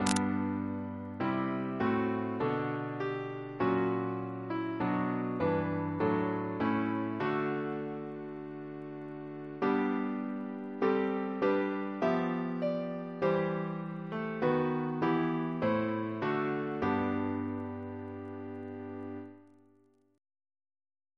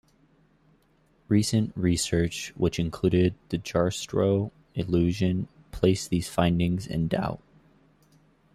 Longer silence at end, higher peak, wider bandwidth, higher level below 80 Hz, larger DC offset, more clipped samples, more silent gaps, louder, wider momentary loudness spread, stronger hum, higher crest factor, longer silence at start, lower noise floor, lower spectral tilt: first, 1.75 s vs 1.2 s; about the same, -8 dBFS vs -8 dBFS; second, 11 kHz vs 14 kHz; second, -68 dBFS vs -48 dBFS; neither; neither; neither; second, -34 LUFS vs -26 LUFS; first, 12 LU vs 8 LU; neither; first, 26 dB vs 20 dB; second, 0 s vs 1.3 s; about the same, -67 dBFS vs -64 dBFS; about the same, -6.5 dB/octave vs -6 dB/octave